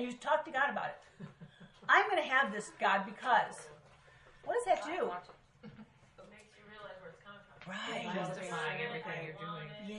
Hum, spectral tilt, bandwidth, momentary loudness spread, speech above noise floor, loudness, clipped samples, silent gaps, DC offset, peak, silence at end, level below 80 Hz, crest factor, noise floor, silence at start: none; -4 dB/octave; 11 kHz; 24 LU; 26 dB; -34 LUFS; under 0.1%; none; under 0.1%; -12 dBFS; 0 s; -74 dBFS; 24 dB; -61 dBFS; 0 s